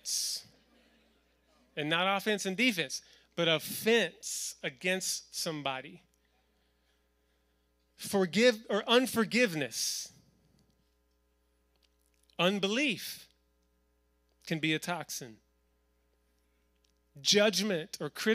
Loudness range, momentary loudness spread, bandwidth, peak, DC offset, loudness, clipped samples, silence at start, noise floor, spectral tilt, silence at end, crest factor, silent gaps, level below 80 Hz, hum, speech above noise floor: 9 LU; 15 LU; 15.5 kHz; -12 dBFS; under 0.1%; -31 LUFS; under 0.1%; 0.05 s; -73 dBFS; -3 dB/octave; 0 s; 22 dB; none; -76 dBFS; 60 Hz at -70 dBFS; 42 dB